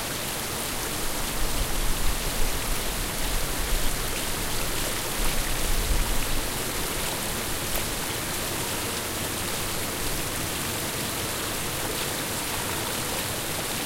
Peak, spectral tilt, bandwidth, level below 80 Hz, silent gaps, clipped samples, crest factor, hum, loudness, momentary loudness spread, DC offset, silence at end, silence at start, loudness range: -10 dBFS; -2.5 dB/octave; 16 kHz; -32 dBFS; none; under 0.1%; 16 dB; none; -28 LUFS; 1 LU; under 0.1%; 0 s; 0 s; 1 LU